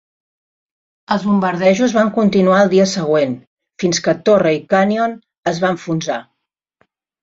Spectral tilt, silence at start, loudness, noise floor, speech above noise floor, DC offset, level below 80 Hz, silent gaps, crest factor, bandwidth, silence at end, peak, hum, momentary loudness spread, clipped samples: -5.5 dB/octave; 1.1 s; -15 LUFS; -76 dBFS; 61 dB; under 0.1%; -58 dBFS; 3.47-3.57 s, 5.38-5.43 s; 14 dB; 7.8 kHz; 1 s; -2 dBFS; none; 9 LU; under 0.1%